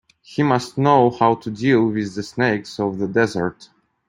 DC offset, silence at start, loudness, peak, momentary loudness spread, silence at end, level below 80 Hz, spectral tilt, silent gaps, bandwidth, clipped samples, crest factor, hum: under 0.1%; 0.3 s; -19 LUFS; -2 dBFS; 10 LU; 0.55 s; -58 dBFS; -6.5 dB/octave; none; 11 kHz; under 0.1%; 18 dB; none